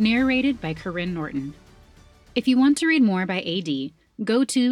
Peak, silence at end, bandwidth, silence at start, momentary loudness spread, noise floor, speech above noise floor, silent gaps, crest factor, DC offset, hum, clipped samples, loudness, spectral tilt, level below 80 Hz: -8 dBFS; 0 s; 12 kHz; 0 s; 12 LU; -51 dBFS; 30 dB; none; 14 dB; under 0.1%; none; under 0.1%; -22 LUFS; -5 dB/octave; -52 dBFS